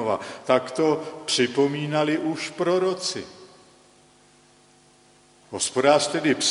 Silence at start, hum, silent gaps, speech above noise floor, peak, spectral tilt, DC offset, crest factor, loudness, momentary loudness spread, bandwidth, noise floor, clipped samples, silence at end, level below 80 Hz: 0 s; 50 Hz at -55 dBFS; none; 33 dB; -4 dBFS; -3.5 dB/octave; under 0.1%; 20 dB; -23 LUFS; 10 LU; 11.5 kHz; -56 dBFS; under 0.1%; 0 s; -70 dBFS